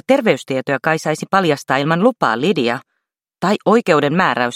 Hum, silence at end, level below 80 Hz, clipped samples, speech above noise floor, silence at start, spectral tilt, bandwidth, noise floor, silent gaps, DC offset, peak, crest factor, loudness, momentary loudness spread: none; 0 s; -62 dBFS; under 0.1%; 59 dB; 0.1 s; -5.5 dB/octave; 15.5 kHz; -75 dBFS; none; under 0.1%; 0 dBFS; 16 dB; -16 LUFS; 6 LU